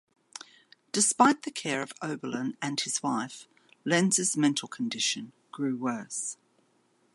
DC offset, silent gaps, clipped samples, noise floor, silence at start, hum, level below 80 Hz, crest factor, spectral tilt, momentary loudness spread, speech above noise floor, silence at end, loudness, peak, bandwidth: under 0.1%; none; under 0.1%; -69 dBFS; 0.35 s; none; -82 dBFS; 22 dB; -3 dB/octave; 21 LU; 40 dB; 0.8 s; -28 LUFS; -8 dBFS; 11.5 kHz